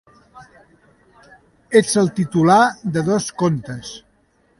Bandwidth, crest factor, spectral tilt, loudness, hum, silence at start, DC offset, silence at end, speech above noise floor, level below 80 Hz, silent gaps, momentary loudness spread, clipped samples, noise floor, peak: 11.5 kHz; 20 dB; -5.5 dB/octave; -17 LUFS; none; 0.35 s; under 0.1%; 0.6 s; 43 dB; -56 dBFS; none; 18 LU; under 0.1%; -59 dBFS; 0 dBFS